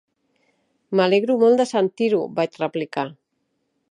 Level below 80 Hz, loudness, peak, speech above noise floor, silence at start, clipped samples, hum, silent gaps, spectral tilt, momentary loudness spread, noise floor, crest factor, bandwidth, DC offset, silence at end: -74 dBFS; -20 LUFS; -4 dBFS; 53 dB; 0.9 s; under 0.1%; none; none; -6 dB/octave; 10 LU; -73 dBFS; 18 dB; 11 kHz; under 0.1%; 0.8 s